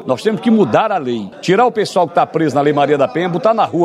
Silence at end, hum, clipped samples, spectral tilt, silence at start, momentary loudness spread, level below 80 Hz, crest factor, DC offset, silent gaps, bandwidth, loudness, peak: 0 s; none; under 0.1%; -6.5 dB/octave; 0 s; 5 LU; -62 dBFS; 14 dB; under 0.1%; none; 12.5 kHz; -14 LUFS; 0 dBFS